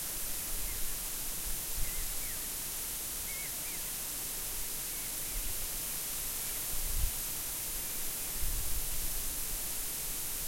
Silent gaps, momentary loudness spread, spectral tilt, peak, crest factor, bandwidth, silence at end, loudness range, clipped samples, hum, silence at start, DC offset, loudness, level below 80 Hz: none; 1 LU; -1 dB/octave; -18 dBFS; 18 dB; 16.5 kHz; 0 s; 1 LU; under 0.1%; none; 0 s; under 0.1%; -35 LUFS; -42 dBFS